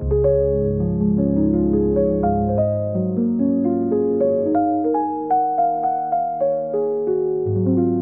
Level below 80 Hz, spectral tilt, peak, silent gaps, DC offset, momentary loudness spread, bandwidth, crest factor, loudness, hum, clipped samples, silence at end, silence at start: -36 dBFS; -14 dB/octave; -8 dBFS; none; 0.2%; 3 LU; 2.4 kHz; 12 dB; -19 LUFS; none; under 0.1%; 0 s; 0 s